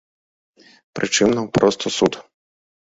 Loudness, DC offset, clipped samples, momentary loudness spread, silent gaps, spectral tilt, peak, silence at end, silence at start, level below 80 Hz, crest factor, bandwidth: -19 LUFS; under 0.1%; under 0.1%; 14 LU; none; -4 dB/octave; -2 dBFS; 0.75 s; 0.95 s; -54 dBFS; 20 dB; 8 kHz